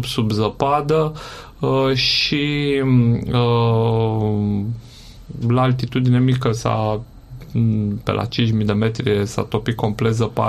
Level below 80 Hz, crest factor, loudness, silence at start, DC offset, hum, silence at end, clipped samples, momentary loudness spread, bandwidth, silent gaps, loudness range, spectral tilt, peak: -42 dBFS; 16 dB; -19 LUFS; 0 s; under 0.1%; none; 0 s; under 0.1%; 9 LU; 13 kHz; none; 3 LU; -6.5 dB/octave; -2 dBFS